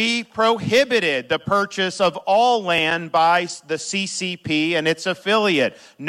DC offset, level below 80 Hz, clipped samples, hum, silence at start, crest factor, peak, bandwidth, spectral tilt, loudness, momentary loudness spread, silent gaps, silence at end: under 0.1%; -62 dBFS; under 0.1%; none; 0 s; 14 dB; -6 dBFS; 15.5 kHz; -3.5 dB/octave; -19 LUFS; 7 LU; none; 0 s